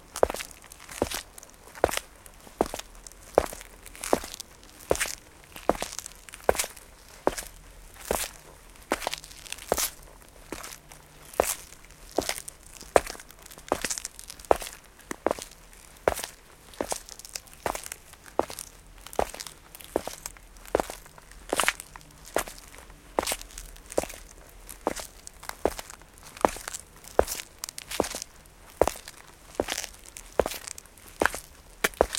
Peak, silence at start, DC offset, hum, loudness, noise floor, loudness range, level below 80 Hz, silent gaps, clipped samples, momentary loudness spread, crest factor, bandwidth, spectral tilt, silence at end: -2 dBFS; 0 s; under 0.1%; none; -31 LUFS; -51 dBFS; 4 LU; -48 dBFS; none; under 0.1%; 20 LU; 30 dB; 17 kHz; -2.5 dB/octave; 0 s